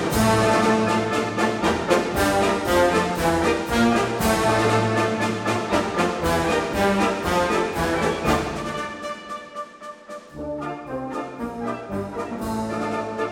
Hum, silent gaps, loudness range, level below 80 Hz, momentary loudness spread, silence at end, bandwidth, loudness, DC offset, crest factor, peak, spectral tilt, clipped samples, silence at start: none; none; 11 LU; -42 dBFS; 13 LU; 0 s; 17 kHz; -22 LUFS; under 0.1%; 18 dB; -4 dBFS; -5 dB/octave; under 0.1%; 0 s